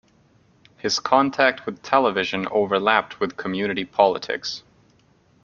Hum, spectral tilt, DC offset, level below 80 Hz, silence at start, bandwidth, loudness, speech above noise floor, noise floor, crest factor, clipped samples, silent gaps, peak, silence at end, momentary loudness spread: none; -4 dB/octave; under 0.1%; -64 dBFS; 0.85 s; 7.4 kHz; -21 LUFS; 37 dB; -59 dBFS; 22 dB; under 0.1%; none; -2 dBFS; 0.85 s; 9 LU